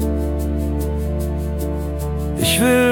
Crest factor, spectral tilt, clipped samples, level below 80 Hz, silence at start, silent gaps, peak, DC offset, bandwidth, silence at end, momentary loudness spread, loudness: 16 dB; -5 dB/octave; under 0.1%; -26 dBFS; 0 s; none; -4 dBFS; under 0.1%; 18 kHz; 0 s; 9 LU; -20 LUFS